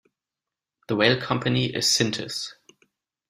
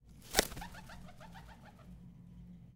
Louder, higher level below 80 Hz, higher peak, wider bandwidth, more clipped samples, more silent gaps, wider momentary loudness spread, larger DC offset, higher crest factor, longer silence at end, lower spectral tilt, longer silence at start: first, -23 LUFS vs -36 LUFS; second, -60 dBFS vs -54 dBFS; first, -2 dBFS vs -6 dBFS; second, 15.5 kHz vs 17.5 kHz; neither; neither; second, 11 LU vs 22 LU; neither; second, 24 dB vs 38 dB; first, 0.75 s vs 0 s; first, -3.5 dB/octave vs -2 dB/octave; first, 0.9 s vs 0 s